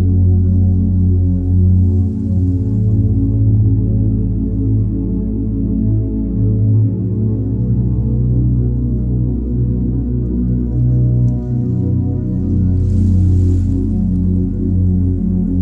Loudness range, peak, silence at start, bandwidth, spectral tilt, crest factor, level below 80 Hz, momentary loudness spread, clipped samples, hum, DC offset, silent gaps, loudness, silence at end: 2 LU; -4 dBFS; 0 s; 1.3 kHz; -13 dB/octave; 10 dB; -22 dBFS; 5 LU; under 0.1%; none; under 0.1%; none; -15 LUFS; 0 s